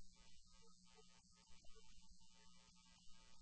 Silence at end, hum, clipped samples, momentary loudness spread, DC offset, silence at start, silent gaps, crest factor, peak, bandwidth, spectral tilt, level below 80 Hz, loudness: 0 s; none; under 0.1%; 1 LU; under 0.1%; 0 s; none; 14 dB; -46 dBFS; 8.4 kHz; -2.5 dB/octave; -72 dBFS; -69 LUFS